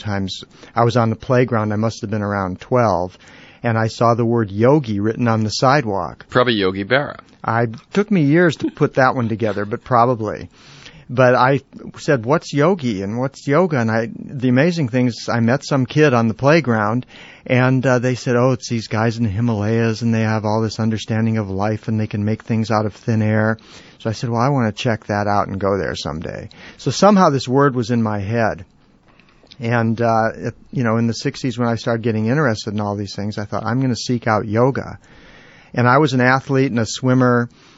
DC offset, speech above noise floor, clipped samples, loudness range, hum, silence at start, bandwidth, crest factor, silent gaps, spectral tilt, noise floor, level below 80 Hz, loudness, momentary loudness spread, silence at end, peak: under 0.1%; 34 dB; under 0.1%; 3 LU; none; 0 s; 8 kHz; 18 dB; none; -6 dB/octave; -51 dBFS; -52 dBFS; -18 LUFS; 10 LU; 0.3 s; 0 dBFS